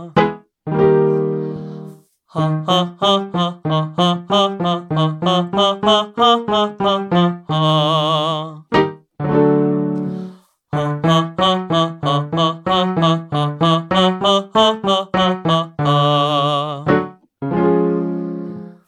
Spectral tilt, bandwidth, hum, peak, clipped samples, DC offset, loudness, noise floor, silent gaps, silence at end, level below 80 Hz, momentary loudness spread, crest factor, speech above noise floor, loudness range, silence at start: -6.5 dB/octave; 10 kHz; none; 0 dBFS; under 0.1%; under 0.1%; -17 LUFS; -39 dBFS; none; 0.15 s; -52 dBFS; 10 LU; 16 dB; 23 dB; 3 LU; 0 s